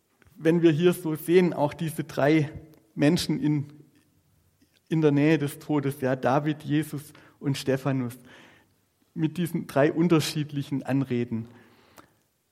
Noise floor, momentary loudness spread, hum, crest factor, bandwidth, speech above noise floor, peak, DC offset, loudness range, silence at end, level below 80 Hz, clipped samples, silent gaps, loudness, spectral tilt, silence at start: -67 dBFS; 13 LU; none; 20 dB; 16 kHz; 43 dB; -8 dBFS; under 0.1%; 5 LU; 1.05 s; -64 dBFS; under 0.1%; none; -26 LUFS; -6.5 dB/octave; 0.4 s